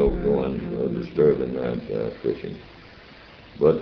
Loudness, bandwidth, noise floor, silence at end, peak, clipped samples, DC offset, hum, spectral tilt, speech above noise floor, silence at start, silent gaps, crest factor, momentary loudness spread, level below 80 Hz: -24 LUFS; 5.6 kHz; -46 dBFS; 0 s; -6 dBFS; under 0.1%; under 0.1%; none; -10 dB/octave; 22 dB; 0 s; none; 18 dB; 25 LU; -40 dBFS